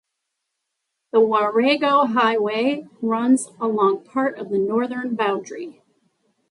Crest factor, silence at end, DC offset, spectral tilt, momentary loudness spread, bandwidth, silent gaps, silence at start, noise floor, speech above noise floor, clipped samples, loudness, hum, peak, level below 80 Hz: 16 dB; 0.8 s; under 0.1%; -4.5 dB/octave; 8 LU; 11.5 kHz; none; 1.15 s; -79 dBFS; 59 dB; under 0.1%; -20 LUFS; none; -4 dBFS; -74 dBFS